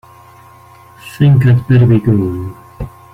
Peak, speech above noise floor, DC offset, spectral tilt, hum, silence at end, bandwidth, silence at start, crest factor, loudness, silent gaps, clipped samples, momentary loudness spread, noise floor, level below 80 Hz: -2 dBFS; 30 dB; under 0.1%; -9 dB/octave; none; 0.25 s; 11 kHz; 1.05 s; 12 dB; -11 LUFS; none; under 0.1%; 20 LU; -40 dBFS; -38 dBFS